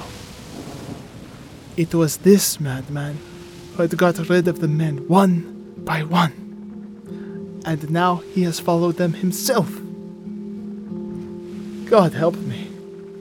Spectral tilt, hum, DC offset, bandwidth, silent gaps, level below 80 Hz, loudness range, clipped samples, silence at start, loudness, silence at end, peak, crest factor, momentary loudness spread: -5.5 dB/octave; none; under 0.1%; 19 kHz; none; -54 dBFS; 4 LU; under 0.1%; 0 s; -20 LUFS; 0 s; -2 dBFS; 20 dB; 20 LU